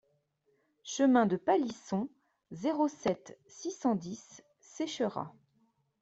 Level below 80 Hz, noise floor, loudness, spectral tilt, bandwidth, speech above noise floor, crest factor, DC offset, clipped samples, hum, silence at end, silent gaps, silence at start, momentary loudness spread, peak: -74 dBFS; -75 dBFS; -32 LUFS; -5.5 dB/octave; 8 kHz; 43 dB; 20 dB; under 0.1%; under 0.1%; none; 0.7 s; none; 0.85 s; 19 LU; -14 dBFS